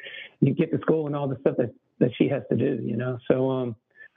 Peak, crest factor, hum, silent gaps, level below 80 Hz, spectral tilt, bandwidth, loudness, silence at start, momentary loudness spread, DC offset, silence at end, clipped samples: -4 dBFS; 22 dB; none; none; -66 dBFS; -7.5 dB/octave; 3.9 kHz; -26 LUFS; 0 s; 7 LU; under 0.1%; 0.1 s; under 0.1%